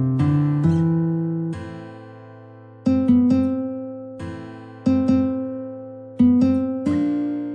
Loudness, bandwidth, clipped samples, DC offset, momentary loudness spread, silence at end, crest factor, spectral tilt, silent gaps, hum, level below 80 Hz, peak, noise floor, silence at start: -20 LUFS; 7 kHz; under 0.1%; under 0.1%; 19 LU; 0 s; 14 dB; -10 dB/octave; none; none; -54 dBFS; -6 dBFS; -43 dBFS; 0 s